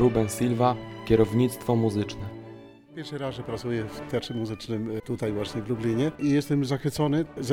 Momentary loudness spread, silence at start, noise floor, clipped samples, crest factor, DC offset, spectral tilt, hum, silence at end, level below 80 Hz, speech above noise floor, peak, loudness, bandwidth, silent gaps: 11 LU; 0 s; -46 dBFS; under 0.1%; 18 dB; under 0.1%; -6.5 dB/octave; none; 0 s; -50 dBFS; 20 dB; -8 dBFS; -27 LUFS; 16.5 kHz; none